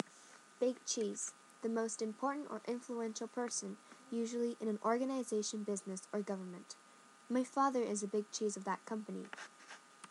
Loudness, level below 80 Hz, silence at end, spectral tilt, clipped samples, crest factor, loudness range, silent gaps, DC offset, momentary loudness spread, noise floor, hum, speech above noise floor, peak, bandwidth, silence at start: -40 LUFS; under -90 dBFS; 0 s; -4 dB/octave; under 0.1%; 22 dB; 1 LU; none; under 0.1%; 16 LU; -61 dBFS; none; 22 dB; -18 dBFS; 12 kHz; 0.05 s